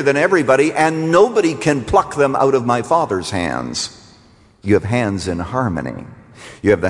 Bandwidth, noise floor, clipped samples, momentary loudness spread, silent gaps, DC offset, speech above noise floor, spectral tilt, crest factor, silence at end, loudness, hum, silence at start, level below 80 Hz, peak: 11.5 kHz; -49 dBFS; under 0.1%; 10 LU; none; under 0.1%; 33 dB; -5.5 dB/octave; 16 dB; 0 s; -16 LUFS; none; 0 s; -44 dBFS; -2 dBFS